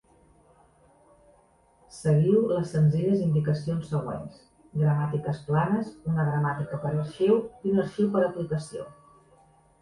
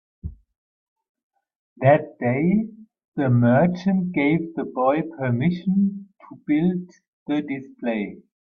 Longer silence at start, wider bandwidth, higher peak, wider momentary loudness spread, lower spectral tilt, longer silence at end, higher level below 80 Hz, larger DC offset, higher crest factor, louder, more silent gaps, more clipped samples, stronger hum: first, 1.95 s vs 0.25 s; first, 11 kHz vs 6.4 kHz; second, -10 dBFS vs -4 dBFS; second, 10 LU vs 16 LU; second, -8.5 dB/octave vs -10 dB/octave; first, 0.9 s vs 0.25 s; about the same, -58 dBFS vs -54 dBFS; neither; about the same, 16 dB vs 18 dB; second, -26 LUFS vs -22 LUFS; second, none vs 0.56-0.96 s, 1.09-1.15 s, 1.23-1.30 s, 1.56-1.76 s, 3.05-3.12 s, 7.08-7.26 s; neither; neither